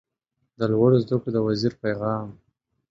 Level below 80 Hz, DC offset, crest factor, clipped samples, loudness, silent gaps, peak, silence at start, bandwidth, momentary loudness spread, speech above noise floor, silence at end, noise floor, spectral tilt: -58 dBFS; under 0.1%; 18 dB; under 0.1%; -23 LUFS; none; -6 dBFS; 0.6 s; 7.6 kHz; 10 LU; 54 dB; 0.55 s; -77 dBFS; -8.5 dB/octave